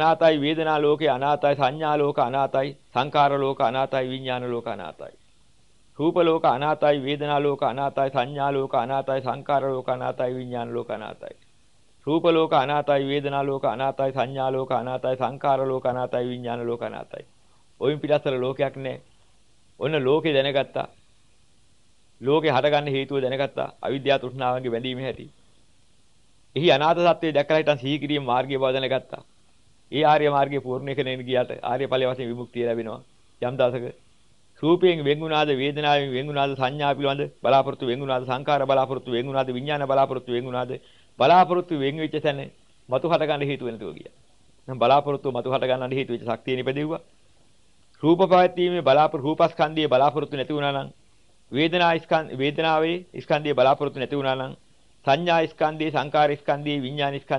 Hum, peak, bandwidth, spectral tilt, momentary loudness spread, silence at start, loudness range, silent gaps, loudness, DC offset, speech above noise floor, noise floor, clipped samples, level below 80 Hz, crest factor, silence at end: none; -6 dBFS; 11 kHz; -7 dB/octave; 11 LU; 0 s; 5 LU; none; -23 LUFS; 0.2%; 40 dB; -63 dBFS; under 0.1%; -64 dBFS; 18 dB; 0 s